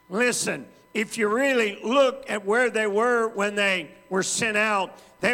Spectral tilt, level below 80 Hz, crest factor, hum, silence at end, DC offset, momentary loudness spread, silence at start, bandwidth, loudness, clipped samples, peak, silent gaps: -3 dB/octave; -70 dBFS; 16 dB; none; 0 s; under 0.1%; 8 LU; 0.1 s; 17 kHz; -23 LUFS; under 0.1%; -8 dBFS; none